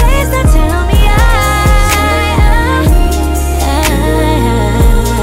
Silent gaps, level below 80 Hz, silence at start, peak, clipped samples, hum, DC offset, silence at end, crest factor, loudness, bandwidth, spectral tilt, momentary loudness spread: none; -10 dBFS; 0 s; 0 dBFS; under 0.1%; none; under 0.1%; 0 s; 8 dB; -11 LUFS; 16.5 kHz; -5 dB/octave; 2 LU